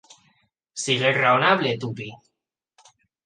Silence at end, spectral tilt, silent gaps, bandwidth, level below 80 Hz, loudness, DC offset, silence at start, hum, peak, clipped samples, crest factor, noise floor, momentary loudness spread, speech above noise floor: 1.1 s; -4 dB/octave; none; 10 kHz; -68 dBFS; -21 LUFS; under 0.1%; 0.75 s; none; -4 dBFS; under 0.1%; 20 dB; -82 dBFS; 19 LU; 61 dB